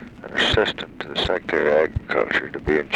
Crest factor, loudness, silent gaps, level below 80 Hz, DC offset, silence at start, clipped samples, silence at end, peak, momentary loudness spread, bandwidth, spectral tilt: 18 dB; -21 LUFS; none; -40 dBFS; under 0.1%; 0 s; under 0.1%; 0 s; -4 dBFS; 8 LU; 11.5 kHz; -5 dB/octave